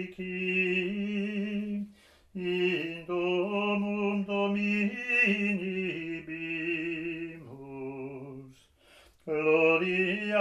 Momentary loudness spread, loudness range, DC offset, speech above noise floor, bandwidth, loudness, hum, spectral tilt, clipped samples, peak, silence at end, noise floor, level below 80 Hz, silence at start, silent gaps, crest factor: 17 LU; 7 LU; under 0.1%; 29 dB; 10.5 kHz; -29 LUFS; none; -6.5 dB/octave; under 0.1%; -12 dBFS; 0 s; -59 dBFS; -68 dBFS; 0 s; none; 18 dB